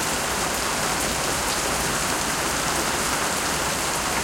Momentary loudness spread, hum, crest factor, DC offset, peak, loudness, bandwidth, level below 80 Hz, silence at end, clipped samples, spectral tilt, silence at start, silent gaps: 1 LU; none; 14 dB; under 0.1%; -10 dBFS; -23 LUFS; 16.5 kHz; -42 dBFS; 0 s; under 0.1%; -2 dB/octave; 0 s; none